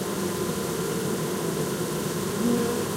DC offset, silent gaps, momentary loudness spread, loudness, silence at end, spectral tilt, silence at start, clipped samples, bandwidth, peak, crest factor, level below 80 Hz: under 0.1%; none; 3 LU; -27 LUFS; 0 s; -4.5 dB/octave; 0 s; under 0.1%; 16 kHz; -12 dBFS; 14 dB; -54 dBFS